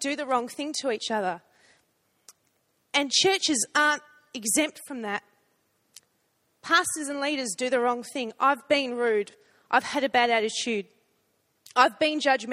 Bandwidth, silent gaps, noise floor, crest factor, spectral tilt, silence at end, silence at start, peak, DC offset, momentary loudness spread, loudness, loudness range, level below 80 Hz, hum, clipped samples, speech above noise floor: 15.5 kHz; none; -72 dBFS; 22 dB; -1.5 dB/octave; 0 s; 0 s; -4 dBFS; under 0.1%; 11 LU; -25 LUFS; 3 LU; -76 dBFS; none; under 0.1%; 46 dB